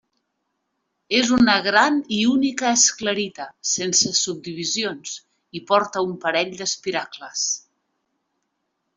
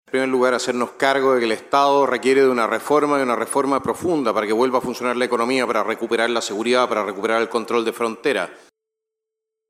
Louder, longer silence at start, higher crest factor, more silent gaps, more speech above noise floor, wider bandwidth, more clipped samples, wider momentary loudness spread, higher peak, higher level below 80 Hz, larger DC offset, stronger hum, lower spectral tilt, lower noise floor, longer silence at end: about the same, -20 LUFS vs -19 LUFS; first, 1.1 s vs 0.15 s; about the same, 20 dB vs 16 dB; neither; second, 54 dB vs 64 dB; second, 8.2 kHz vs 16 kHz; neither; first, 13 LU vs 5 LU; about the same, -2 dBFS vs -4 dBFS; first, -60 dBFS vs -66 dBFS; neither; neither; second, -2 dB/octave vs -3.5 dB/octave; second, -75 dBFS vs -83 dBFS; first, 1.35 s vs 1.15 s